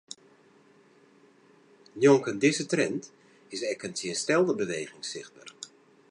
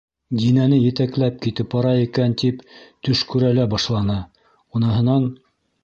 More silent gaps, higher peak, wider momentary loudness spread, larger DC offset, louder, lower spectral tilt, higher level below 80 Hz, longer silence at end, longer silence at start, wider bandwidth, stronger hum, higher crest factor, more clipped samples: neither; about the same, -8 dBFS vs -6 dBFS; first, 23 LU vs 10 LU; neither; second, -27 LUFS vs -20 LUFS; second, -4.5 dB/octave vs -7.5 dB/octave; second, -76 dBFS vs -46 dBFS; about the same, 0.45 s vs 0.5 s; first, 1.95 s vs 0.3 s; first, 11 kHz vs 7.4 kHz; neither; first, 22 dB vs 14 dB; neither